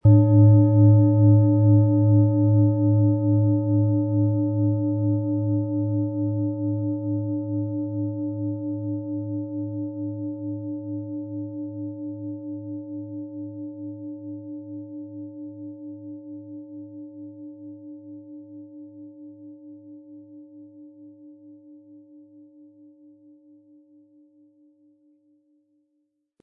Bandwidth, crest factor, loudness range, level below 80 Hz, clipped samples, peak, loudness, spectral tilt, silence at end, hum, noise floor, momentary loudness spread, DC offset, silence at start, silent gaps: 1.3 kHz; 18 dB; 24 LU; -60 dBFS; under 0.1%; -6 dBFS; -22 LUFS; -16.5 dB/octave; 4.65 s; none; -74 dBFS; 25 LU; under 0.1%; 0.05 s; none